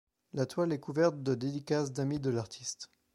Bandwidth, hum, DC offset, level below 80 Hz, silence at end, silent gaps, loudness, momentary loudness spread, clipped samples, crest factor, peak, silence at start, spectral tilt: 13 kHz; none; under 0.1%; -68 dBFS; 0.3 s; none; -34 LUFS; 10 LU; under 0.1%; 18 dB; -16 dBFS; 0.35 s; -6 dB/octave